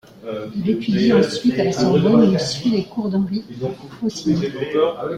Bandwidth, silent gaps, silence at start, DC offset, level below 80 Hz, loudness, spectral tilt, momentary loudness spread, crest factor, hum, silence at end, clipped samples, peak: 11.5 kHz; none; 0.2 s; under 0.1%; -52 dBFS; -19 LUFS; -6.5 dB/octave; 13 LU; 16 dB; none; 0 s; under 0.1%; -2 dBFS